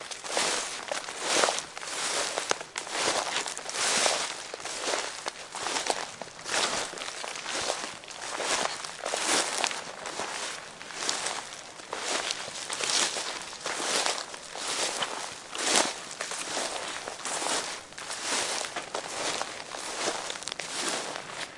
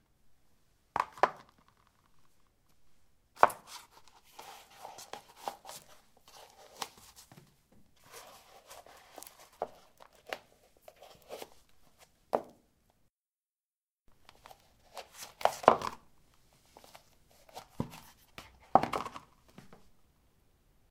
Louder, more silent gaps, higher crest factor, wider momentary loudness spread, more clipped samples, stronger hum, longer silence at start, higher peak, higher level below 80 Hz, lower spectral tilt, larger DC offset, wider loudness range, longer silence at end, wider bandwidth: first, -30 LUFS vs -34 LUFS; second, none vs 13.13-13.17 s, 13.28-13.32 s, 13.60-13.96 s; second, 28 dB vs 38 dB; second, 11 LU vs 28 LU; neither; neither; second, 0 s vs 0.95 s; about the same, -4 dBFS vs -2 dBFS; about the same, -70 dBFS vs -70 dBFS; second, 0 dB/octave vs -4 dB/octave; neither; second, 3 LU vs 15 LU; second, 0 s vs 1.7 s; second, 11.5 kHz vs 16.5 kHz